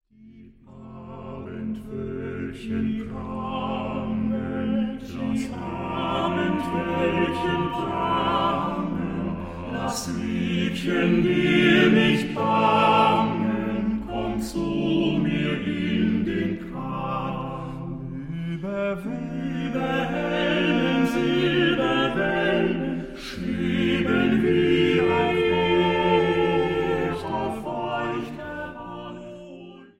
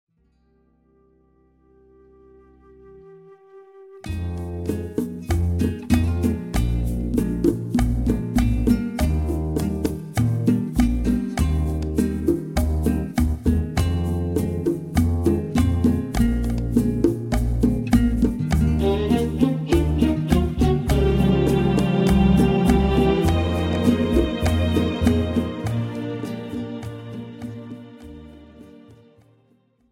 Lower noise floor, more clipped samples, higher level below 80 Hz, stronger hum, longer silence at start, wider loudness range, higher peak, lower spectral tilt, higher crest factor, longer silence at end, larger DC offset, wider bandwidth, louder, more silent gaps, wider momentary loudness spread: second, -48 dBFS vs -62 dBFS; neither; second, -46 dBFS vs -28 dBFS; neither; second, 0.2 s vs 2.85 s; second, 9 LU vs 12 LU; about the same, -6 dBFS vs -4 dBFS; about the same, -6.5 dB/octave vs -7.5 dB/octave; about the same, 18 dB vs 16 dB; second, 0.15 s vs 1 s; neither; about the same, 15.5 kHz vs 16.5 kHz; about the same, -24 LUFS vs -22 LUFS; neither; about the same, 13 LU vs 11 LU